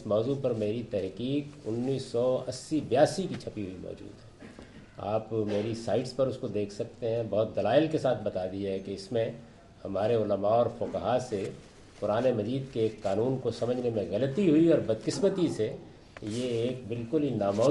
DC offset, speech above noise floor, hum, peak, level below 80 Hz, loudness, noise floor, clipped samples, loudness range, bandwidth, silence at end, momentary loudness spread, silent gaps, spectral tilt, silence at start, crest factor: under 0.1%; 20 dB; none; -10 dBFS; -60 dBFS; -30 LUFS; -49 dBFS; under 0.1%; 4 LU; 11.5 kHz; 0 s; 14 LU; none; -6.5 dB/octave; 0 s; 20 dB